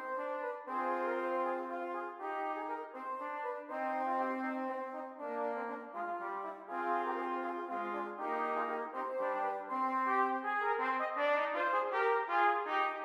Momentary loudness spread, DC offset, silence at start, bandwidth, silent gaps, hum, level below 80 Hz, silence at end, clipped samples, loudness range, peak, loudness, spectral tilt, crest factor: 9 LU; under 0.1%; 0 s; 13.5 kHz; none; none; under -90 dBFS; 0 s; under 0.1%; 6 LU; -20 dBFS; -36 LUFS; -4.5 dB/octave; 16 dB